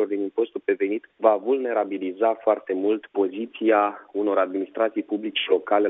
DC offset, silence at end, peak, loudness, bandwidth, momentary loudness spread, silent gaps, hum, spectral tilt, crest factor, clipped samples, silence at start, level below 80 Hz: under 0.1%; 0 s; -4 dBFS; -24 LUFS; 3.9 kHz; 6 LU; none; none; -2 dB/octave; 20 dB; under 0.1%; 0 s; -78 dBFS